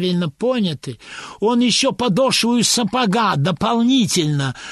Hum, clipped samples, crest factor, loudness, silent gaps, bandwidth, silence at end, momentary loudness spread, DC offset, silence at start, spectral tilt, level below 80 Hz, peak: none; under 0.1%; 14 dB; -17 LUFS; none; 12.5 kHz; 0 s; 8 LU; under 0.1%; 0 s; -4 dB/octave; -52 dBFS; -4 dBFS